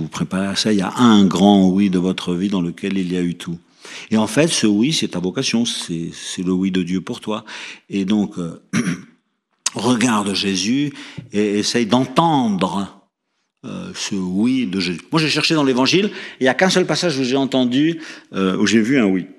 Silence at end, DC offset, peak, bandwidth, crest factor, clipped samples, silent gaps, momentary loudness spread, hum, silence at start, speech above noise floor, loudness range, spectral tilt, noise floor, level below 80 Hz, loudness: 0.05 s; under 0.1%; 0 dBFS; 12.5 kHz; 18 dB; under 0.1%; none; 12 LU; none; 0 s; 54 dB; 5 LU; -4.5 dB/octave; -72 dBFS; -60 dBFS; -18 LUFS